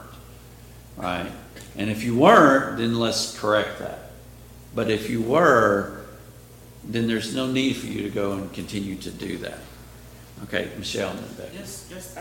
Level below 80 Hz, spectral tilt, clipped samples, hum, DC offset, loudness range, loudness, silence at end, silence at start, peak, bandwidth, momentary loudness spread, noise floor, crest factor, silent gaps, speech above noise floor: -50 dBFS; -5 dB/octave; under 0.1%; 60 Hz at -50 dBFS; under 0.1%; 11 LU; -22 LUFS; 0 s; 0 s; -2 dBFS; 17 kHz; 23 LU; -45 dBFS; 24 dB; none; 23 dB